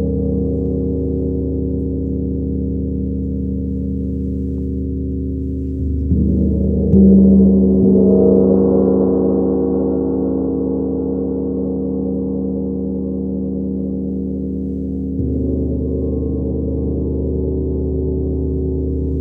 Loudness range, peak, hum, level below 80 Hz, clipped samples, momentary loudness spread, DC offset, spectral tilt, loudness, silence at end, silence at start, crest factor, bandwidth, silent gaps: 9 LU; -2 dBFS; none; -26 dBFS; under 0.1%; 10 LU; under 0.1%; -14.5 dB/octave; -17 LUFS; 0 s; 0 s; 16 dB; 1.5 kHz; none